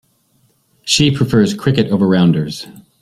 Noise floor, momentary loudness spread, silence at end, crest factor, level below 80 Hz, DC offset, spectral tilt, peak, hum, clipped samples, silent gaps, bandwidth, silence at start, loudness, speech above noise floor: -58 dBFS; 16 LU; 0.2 s; 16 dB; -46 dBFS; under 0.1%; -5.5 dB/octave; 0 dBFS; none; under 0.1%; none; 14.5 kHz; 0.85 s; -14 LUFS; 45 dB